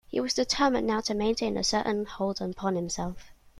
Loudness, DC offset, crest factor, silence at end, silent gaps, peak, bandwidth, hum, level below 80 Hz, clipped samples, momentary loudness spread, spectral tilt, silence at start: -28 LUFS; under 0.1%; 18 dB; 0.1 s; none; -10 dBFS; 14 kHz; none; -50 dBFS; under 0.1%; 8 LU; -4 dB/octave; 0.1 s